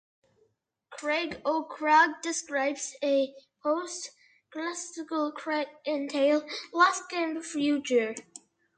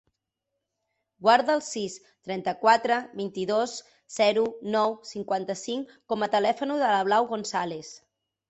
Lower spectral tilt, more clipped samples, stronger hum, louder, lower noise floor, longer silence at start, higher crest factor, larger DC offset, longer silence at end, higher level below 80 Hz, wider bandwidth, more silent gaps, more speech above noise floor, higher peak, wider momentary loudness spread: second, -2 dB/octave vs -3.5 dB/octave; neither; neither; second, -29 LUFS vs -26 LUFS; second, -72 dBFS vs -83 dBFS; second, 0.9 s vs 1.2 s; about the same, 22 dB vs 20 dB; neither; about the same, 0.4 s vs 0.5 s; about the same, -76 dBFS vs -72 dBFS; first, 9.4 kHz vs 8.4 kHz; neither; second, 43 dB vs 57 dB; about the same, -8 dBFS vs -6 dBFS; about the same, 13 LU vs 14 LU